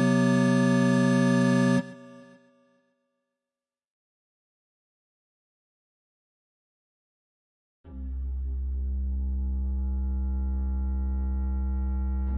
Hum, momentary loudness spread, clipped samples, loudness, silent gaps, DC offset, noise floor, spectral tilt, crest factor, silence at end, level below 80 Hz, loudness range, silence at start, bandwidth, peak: none; 12 LU; under 0.1%; -27 LUFS; 3.91-7.84 s; under 0.1%; under -90 dBFS; -7 dB/octave; 16 dB; 0 s; -32 dBFS; 15 LU; 0 s; 11 kHz; -12 dBFS